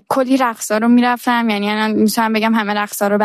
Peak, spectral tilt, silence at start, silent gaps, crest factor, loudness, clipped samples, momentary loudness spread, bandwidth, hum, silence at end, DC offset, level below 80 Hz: -4 dBFS; -4.5 dB/octave; 0.1 s; none; 12 dB; -15 LUFS; under 0.1%; 4 LU; 14 kHz; none; 0 s; under 0.1%; -64 dBFS